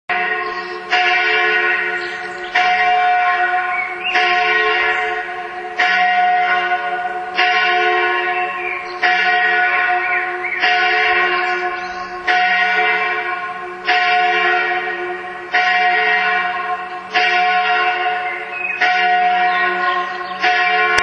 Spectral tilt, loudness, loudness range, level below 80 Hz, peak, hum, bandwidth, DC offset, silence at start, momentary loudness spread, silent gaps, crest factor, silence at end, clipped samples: -2.5 dB/octave; -15 LUFS; 1 LU; -58 dBFS; 0 dBFS; none; 8 kHz; under 0.1%; 0.1 s; 9 LU; none; 16 dB; 0 s; under 0.1%